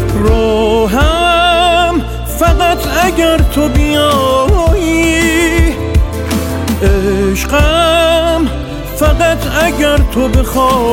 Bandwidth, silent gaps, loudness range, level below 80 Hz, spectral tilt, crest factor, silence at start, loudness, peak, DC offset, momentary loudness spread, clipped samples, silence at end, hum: 17 kHz; none; 1 LU; -16 dBFS; -5 dB/octave; 10 dB; 0 s; -11 LUFS; 0 dBFS; under 0.1%; 6 LU; under 0.1%; 0 s; none